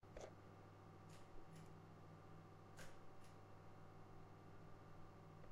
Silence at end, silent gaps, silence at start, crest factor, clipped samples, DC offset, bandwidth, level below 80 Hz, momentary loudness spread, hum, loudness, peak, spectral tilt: 0 s; none; 0 s; 18 dB; under 0.1%; under 0.1%; 15 kHz; -70 dBFS; 3 LU; none; -63 LUFS; -42 dBFS; -6 dB/octave